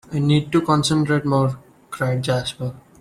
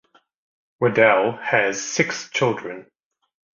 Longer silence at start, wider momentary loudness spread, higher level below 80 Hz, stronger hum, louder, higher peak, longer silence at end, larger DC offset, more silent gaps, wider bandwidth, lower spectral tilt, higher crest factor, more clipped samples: second, 0.1 s vs 0.8 s; about the same, 13 LU vs 13 LU; first, -52 dBFS vs -64 dBFS; neither; about the same, -20 LUFS vs -20 LUFS; second, -6 dBFS vs -2 dBFS; second, 0.2 s vs 0.75 s; neither; neither; first, 13.5 kHz vs 7.6 kHz; first, -6 dB/octave vs -4 dB/octave; second, 14 dB vs 20 dB; neither